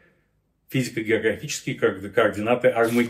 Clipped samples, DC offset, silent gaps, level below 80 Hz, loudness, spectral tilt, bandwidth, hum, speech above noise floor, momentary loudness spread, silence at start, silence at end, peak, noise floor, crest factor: under 0.1%; under 0.1%; none; -64 dBFS; -23 LUFS; -5 dB/octave; 16 kHz; none; 46 dB; 8 LU; 0.7 s; 0 s; -6 dBFS; -68 dBFS; 16 dB